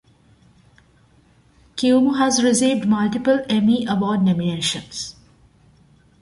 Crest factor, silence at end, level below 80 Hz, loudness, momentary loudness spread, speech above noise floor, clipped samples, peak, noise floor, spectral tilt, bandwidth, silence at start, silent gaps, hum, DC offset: 16 dB; 1.1 s; -56 dBFS; -19 LUFS; 12 LU; 37 dB; under 0.1%; -6 dBFS; -55 dBFS; -4.5 dB/octave; 11.5 kHz; 1.75 s; none; none; under 0.1%